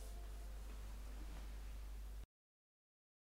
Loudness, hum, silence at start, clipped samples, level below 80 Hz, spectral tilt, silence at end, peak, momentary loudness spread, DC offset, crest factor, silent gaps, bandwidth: -55 LUFS; none; 0 s; under 0.1%; -52 dBFS; -5 dB/octave; 1.05 s; -40 dBFS; 3 LU; under 0.1%; 10 dB; none; 16 kHz